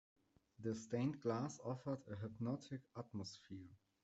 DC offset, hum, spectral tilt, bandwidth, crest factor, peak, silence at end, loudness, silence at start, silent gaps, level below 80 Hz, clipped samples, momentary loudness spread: under 0.1%; none; -6.5 dB/octave; 8.2 kHz; 20 dB; -28 dBFS; 0.3 s; -46 LUFS; 0.6 s; none; -82 dBFS; under 0.1%; 13 LU